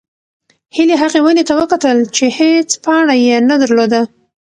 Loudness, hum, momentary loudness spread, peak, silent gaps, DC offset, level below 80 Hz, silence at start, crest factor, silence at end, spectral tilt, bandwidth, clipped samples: -11 LUFS; none; 4 LU; 0 dBFS; none; under 0.1%; -56 dBFS; 0.75 s; 12 dB; 0.35 s; -3 dB/octave; 10.5 kHz; under 0.1%